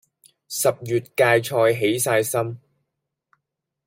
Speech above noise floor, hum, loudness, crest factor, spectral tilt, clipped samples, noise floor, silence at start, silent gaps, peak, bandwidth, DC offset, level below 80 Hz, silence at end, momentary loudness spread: 60 dB; none; -21 LUFS; 20 dB; -4 dB/octave; under 0.1%; -81 dBFS; 0.5 s; none; -4 dBFS; 16.5 kHz; under 0.1%; -66 dBFS; 1.3 s; 11 LU